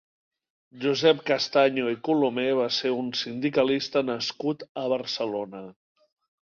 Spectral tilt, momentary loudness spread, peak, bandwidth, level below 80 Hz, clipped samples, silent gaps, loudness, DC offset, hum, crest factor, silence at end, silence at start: -4.5 dB/octave; 9 LU; -6 dBFS; 7.2 kHz; -70 dBFS; under 0.1%; 4.69-4.75 s; -25 LUFS; under 0.1%; none; 20 dB; 0.8 s; 0.75 s